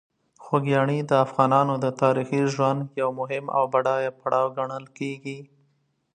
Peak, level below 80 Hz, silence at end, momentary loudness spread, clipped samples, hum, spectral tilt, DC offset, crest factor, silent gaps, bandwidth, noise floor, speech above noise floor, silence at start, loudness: -4 dBFS; -72 dBFS; 0.7 s; 12 LU; under 0.1%; none; -7 dB/octave; under 0.1%; 20 dB; none; 9.6 kHz; -69 dBFS; 46 dB; 0.4 s; -24 LUFS